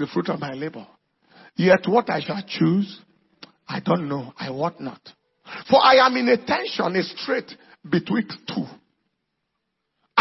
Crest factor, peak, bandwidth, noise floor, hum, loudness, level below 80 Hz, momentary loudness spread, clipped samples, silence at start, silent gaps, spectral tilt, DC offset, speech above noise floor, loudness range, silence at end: 20 dB; -4 dBFS; 6 kHz; -77 dBFS; none; -22 LUFS; -66 dBFS; 17 LU; under 0.1%; 0 s; none; -6.5 dB/octave; under 0.1%; 56 dB; 7 LU; 0 s